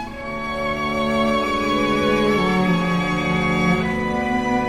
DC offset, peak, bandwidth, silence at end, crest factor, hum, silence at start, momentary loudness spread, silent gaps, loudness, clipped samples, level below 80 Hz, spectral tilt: under 0.1%; -6 dBFS; 15.5 kHz; 0 s; 14 dB; none; 0 s; 5 LU; none; -20 LUFS; under 0.1%; -38 dBFS; -6 dB/octave